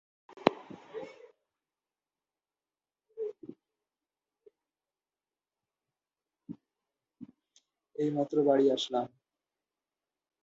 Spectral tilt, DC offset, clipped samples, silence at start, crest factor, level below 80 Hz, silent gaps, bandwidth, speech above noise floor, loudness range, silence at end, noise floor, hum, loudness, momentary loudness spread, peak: -5.5 dB/octave; under 0.1%; under 0.1%; 0.35 s; 32 dB; -84 dBFS; none; 7.8 kHz; over 62 dB; 23 LU; 1.35 s; under -90 dBFS; none; -31 LUFS; 27 LU; -4 dBFS